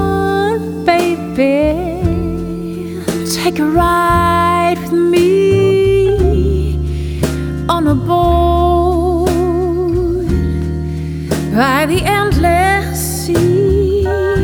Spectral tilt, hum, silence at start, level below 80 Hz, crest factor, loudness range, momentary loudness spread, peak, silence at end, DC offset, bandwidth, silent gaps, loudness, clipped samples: -6 dB/octave; none; 0 s; -22 dBFS; 12 dB; 3 LU; 8 LU; 0 dBFS; 0 s; under 0.1%; over 20 kHz; none; -14 LUFS; under 0.1%